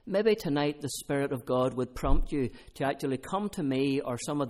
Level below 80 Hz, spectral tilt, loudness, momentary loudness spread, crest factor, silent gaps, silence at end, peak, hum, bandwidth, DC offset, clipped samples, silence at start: -36 dBFS; -5.5 dB/octave; -31 LUFS; 6 LU; 18 dB; none; 0 s; -10 dBFS; none; 16 kHz; under 0.1%; under 0.1%; 0.05 s